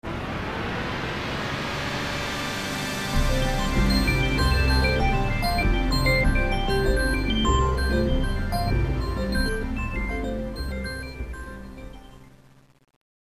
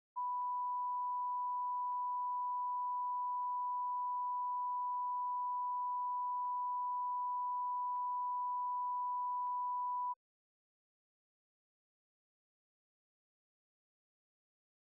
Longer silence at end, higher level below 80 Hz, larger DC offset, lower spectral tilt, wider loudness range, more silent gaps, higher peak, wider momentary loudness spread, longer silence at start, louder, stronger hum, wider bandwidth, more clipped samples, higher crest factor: second, 1.05 s vs 4.8 s; first, -28 dBFS vs under -90 dBFS; first, 0.1% vs under 0.1%; first, -5.5 dB/octave vs 8 dB/octave; first, 8 LU vs 5 LU; neither; first, -8 dBFS vs -36 dBFS; first, 10 LU vs 0 LU; about the same, 0.05 s vs 0.15 s; first, -25 LUFS vs -38 LUFS; neither; first, 14 kHz vs 1.2 kHz; neither; first, 16 dB vs 4 dB